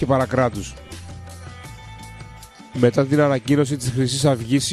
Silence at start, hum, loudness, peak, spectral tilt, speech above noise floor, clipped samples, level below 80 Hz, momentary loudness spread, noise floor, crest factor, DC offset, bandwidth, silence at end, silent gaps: 0 s; none; -19 LUFS; -2 dBFS; -5.5 dB/octave; 22 dB; under 0.1%; -44 dBFS; 20 LU; -41 dBFS; 18 dB; under 0.1%; 14 kHz; 0 s; none